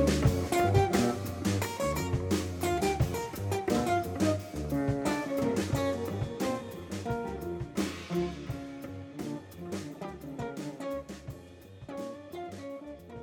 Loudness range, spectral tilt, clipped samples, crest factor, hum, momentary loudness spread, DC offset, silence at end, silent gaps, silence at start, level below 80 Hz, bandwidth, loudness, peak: 11 LU; -6 dB/octave; under 0.1%; 20 dB; none; 14 LU; under 0.1%; 0 s; none; 0 s; -46 dBFS; 20 kHz; -32 LUFS; -12 dBFS